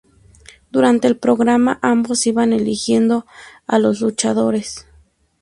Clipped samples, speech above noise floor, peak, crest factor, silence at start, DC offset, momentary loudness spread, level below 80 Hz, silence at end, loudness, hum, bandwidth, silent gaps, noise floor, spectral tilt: under 0.1%; 37 dB; 0 dBFS; 16 dB; 0.75 s; under 0.1%; 8 LU; -54 dBFS; 0.6 s; -16 LUFS; none; 11.5 kHz; none; -53 dBFS; -4.5 dB/octave